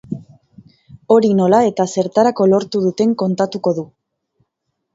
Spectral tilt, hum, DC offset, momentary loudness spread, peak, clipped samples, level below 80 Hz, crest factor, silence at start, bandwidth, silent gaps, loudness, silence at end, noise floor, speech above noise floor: -6.5 dB/octave; none; under 0.1%; 11 LU; 0 dBFS; under 0.1%; -60 dBFS; 16 dB; 0.1 s; 7.8 kHz; none; -15 LUFS; 1.1 s; -74 dBFS; 59 dB